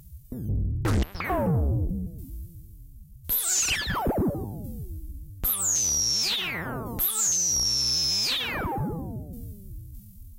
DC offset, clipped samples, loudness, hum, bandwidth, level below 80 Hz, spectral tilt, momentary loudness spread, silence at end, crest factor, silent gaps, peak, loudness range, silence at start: under 0.1%; under 0.1%; -25 LUFS; none; 16 kHz; -38 dBFS; -2.5 dB/octave; 20 LU; 0 s; 14 dB; none; -14 dBFS; 5 LU; 0 s